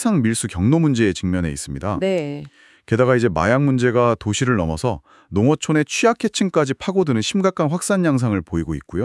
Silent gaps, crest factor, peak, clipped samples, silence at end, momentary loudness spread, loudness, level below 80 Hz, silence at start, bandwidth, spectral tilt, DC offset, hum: none; 16 dB; -4 dBFS; under 0.1%; 0 s; 8 LU; -19 LUFS; -46 dBFS; 0 s; 12 kHz; -5.5 dB/octave; under 0.1%; none